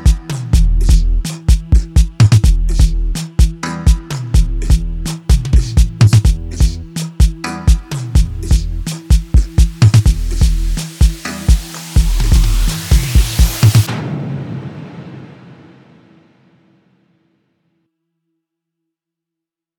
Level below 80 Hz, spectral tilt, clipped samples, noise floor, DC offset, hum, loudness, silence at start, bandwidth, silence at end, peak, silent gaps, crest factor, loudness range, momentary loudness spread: -14 dBFS; -5.5 dB/octave; under 0.1%; -84 dBFS; under 0.1%; none; -15 LUFS; 0 s; 18.5 kHz; 4.55 s; 0 dBFS; none; 12 dB; 3 LU; 12 LU